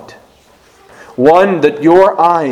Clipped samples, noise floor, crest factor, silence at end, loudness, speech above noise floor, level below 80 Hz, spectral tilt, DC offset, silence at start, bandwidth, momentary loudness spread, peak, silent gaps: 0.7%; -46 dBFS; 12 dB; 0 s; -9 LUFS; 38 dB; -50 dBFS; -7 dB/octave; under 0.1%; 1.2 s; 12 kHz; 4 LU; 0 dBFS; none